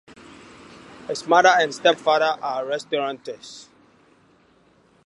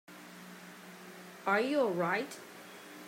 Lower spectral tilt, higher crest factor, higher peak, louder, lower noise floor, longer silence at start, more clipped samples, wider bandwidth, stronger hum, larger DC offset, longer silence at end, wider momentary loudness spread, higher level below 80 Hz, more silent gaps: second, -2.5 dB/octave vs -5 dB/octave; about the same, 22 dB vs 20 dB; first, -2 dBFS vs -18 dBFS; first, -20 LUFS vs -32 LUFS; first, -58 dBFS vs -51 dBFS; first, 0.9 s vs 0.1 s; neither; second, 11.5 kHz vs 16 kHz; neither; neither; first, 1.45 s vs 0 s; about the same, 22 LU vs 20 LU; first, -68 dBFS vs -90 dBFS; neither